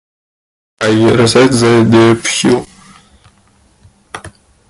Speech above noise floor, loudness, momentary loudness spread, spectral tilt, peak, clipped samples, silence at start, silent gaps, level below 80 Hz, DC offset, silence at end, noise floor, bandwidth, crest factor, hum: 41 dB; -9 LUFS; 22 LU; -5 dB/octave; 0 dBFS; under 0.1%; 0.8 s; none; -44 dBFS; under 0.1%; 0.4 s; -50 dBFS; 11.5 kHz; 12 dB; none